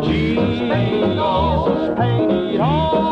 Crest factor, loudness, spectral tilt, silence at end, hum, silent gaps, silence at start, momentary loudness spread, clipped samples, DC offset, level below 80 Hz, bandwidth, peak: 10 dB; -18 LUFS; -8.5 dB/octave; 0 s; none; none; 0 s; 2 LU; under 0.1%; under 0.1%; -34 dBFS; 7.6 kHz; -6 dBFS